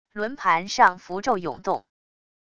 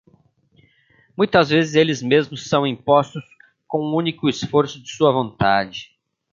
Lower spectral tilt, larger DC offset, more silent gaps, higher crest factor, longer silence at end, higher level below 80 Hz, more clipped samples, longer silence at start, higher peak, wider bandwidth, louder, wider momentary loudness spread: second, -3.5 dB/octave vs -5.5 dB/octave; first, 0.4% vs under 0.1%; neither; about the same, 22 dB vs 18 dB; first, 0.75 s vs 0.5 s; second, -62 dBFS vs -54 dBFS; neither; second, 0.15 s vs 1.2 s; about the same, -4 dBFS vs -2 dBFS; first, 10 kHz vs 7.6 kHz; second, -23 LUFS vs -19 LUFS; about the same, 11 LU vs 11 LU